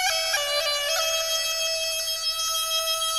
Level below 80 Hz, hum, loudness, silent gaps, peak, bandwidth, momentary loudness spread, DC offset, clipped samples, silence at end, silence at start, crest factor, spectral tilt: -58 dBFS; none; -23 LUFS; none; -10 dBFS; 16 kHz; 2 LU; under 0.1%; under 0.1%; 0 s; 0 s; 16 dB; 3.5 dB/octave